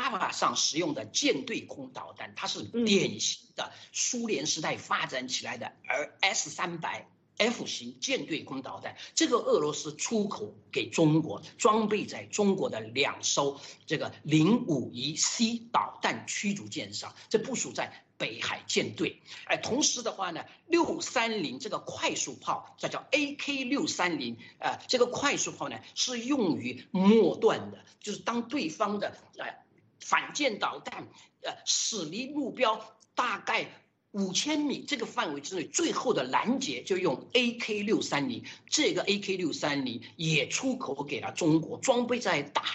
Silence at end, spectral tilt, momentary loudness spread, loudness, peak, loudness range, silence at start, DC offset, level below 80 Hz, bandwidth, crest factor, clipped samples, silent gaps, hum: 0 s; -3 dB/octave; 11 LU; -30 LUFS; -8 dBFS; 3 LU; 0 s; under 0.1%; -76 dBFS; 8.4 kHz; 22 dB; under 0.1%; none; none